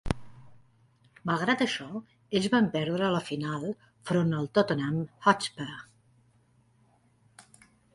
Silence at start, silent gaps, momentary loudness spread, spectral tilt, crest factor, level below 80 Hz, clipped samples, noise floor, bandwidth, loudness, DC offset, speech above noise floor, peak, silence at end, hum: 0.05 s; none; 14 LU; -5.5 dB/octave; 24 dB; -54 dBFS; under 0.1%; -65 dBFS; 11.5 kHz; -29 LUFS; under 0.1%; 37 dB; -6 dBFS; 0.55 s; none